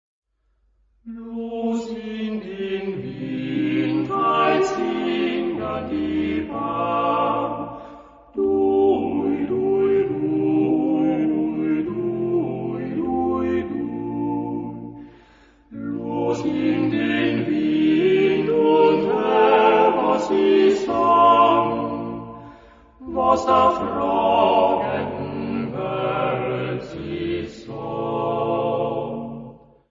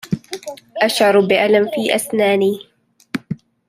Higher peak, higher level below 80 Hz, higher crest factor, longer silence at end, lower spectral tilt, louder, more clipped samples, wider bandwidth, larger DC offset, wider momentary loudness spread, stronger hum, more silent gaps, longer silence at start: about the same, -2 dBFS vs -2 dBFS; first, -52 dBFS vs -60 dBFS; about the same, 18 dB vs 16 dB; about the same, 0.35 s vs 0.35 s; first, -7 dB/octave vs -4.5 dB/octave; second, -21 LUFS vs -16 LUFS; neither; second, 7.6 kHz vs 16 kHz; neither; second, 14 LU vs 17 LU; neither; neither; first, 1.05 s vs 0.05 s